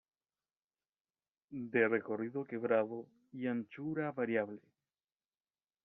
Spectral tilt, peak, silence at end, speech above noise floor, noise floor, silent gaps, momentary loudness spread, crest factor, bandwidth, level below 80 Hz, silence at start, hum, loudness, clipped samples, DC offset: -6 dB/octave; -18 dBFS; 1.25 s; over 53 dB; under -90 dBFS; none; 15 LU; 22 dB; 3.9 kHz; -84 dBFS; 1.5 s; none; -37 LUFS; under 0.1%; under 0.1%